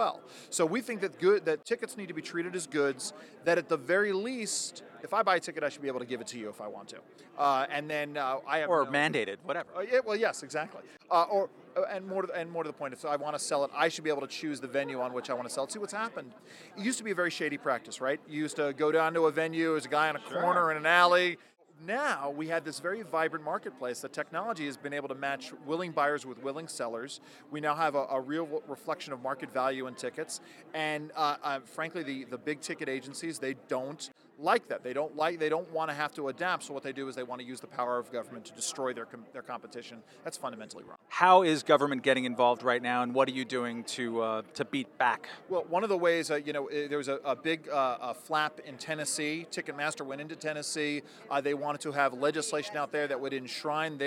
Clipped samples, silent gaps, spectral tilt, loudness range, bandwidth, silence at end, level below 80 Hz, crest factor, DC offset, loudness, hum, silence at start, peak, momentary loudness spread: under 0.1%; none; -3.5 dB/octave; 7 LU; 16.5 kHz; 0 s; -90 dBFS; 24 dB; under 0.1%; -32 LUFS; none; 0 s; -8 dBFS; 13 LU